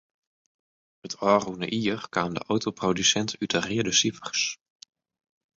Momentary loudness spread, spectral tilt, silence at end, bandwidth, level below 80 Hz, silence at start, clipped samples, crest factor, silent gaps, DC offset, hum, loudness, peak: 7 LU; -3 dB/octave; 1 s; 8 kHz; -62 dBFS; 1.05 s; under 0.1%; 22 dB; none; under 0.1%; none; -25 LUFS; -6 dBFS